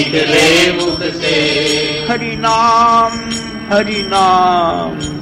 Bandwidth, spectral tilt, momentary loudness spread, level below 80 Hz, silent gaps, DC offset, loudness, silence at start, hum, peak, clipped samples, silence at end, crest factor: 16.5 kHz; -3.5 dB/octave; 9 LU; -40 dBFS; none; under 0.1%; -12 LUFS; 0 s; none; 0 dBFS; under 0.1%; 0 s; 12 dB